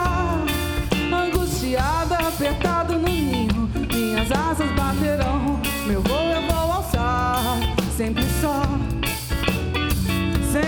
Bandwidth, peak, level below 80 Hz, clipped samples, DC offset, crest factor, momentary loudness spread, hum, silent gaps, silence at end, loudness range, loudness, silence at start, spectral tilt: over 20 kHz; -6 dBFS; -30 dBFS; under 0.1%; under 0.1%; 14 dB; 2 LU; none; none; 0 s; 1 LU; -22 LUFS; 0 s; -5 dB/octave